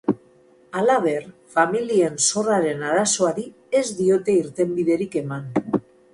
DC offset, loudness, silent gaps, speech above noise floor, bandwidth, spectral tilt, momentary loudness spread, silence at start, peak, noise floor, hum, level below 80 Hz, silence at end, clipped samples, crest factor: under 0.1%; -21 LUFS; none; 33 dB; 11.5 kHz; -4 dB/octave; 9 LU; 0.05 s; -4 dBFS; -54 dBFS; none; -62 dBFS; 0.35 s; under 0.1%; 18 dB